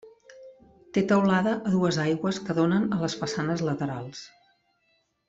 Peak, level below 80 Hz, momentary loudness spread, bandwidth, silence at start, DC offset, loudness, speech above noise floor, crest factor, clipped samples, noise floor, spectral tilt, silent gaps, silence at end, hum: -10 dBFS; -62 dBFS; 10 LU; 7.8 kHz; 0.05 s; under 0.1%; -26 LUFS; 46 dB; 16 dB; under 0.1%; -71 dBFS; -6 dB/octave; none; 1 s; none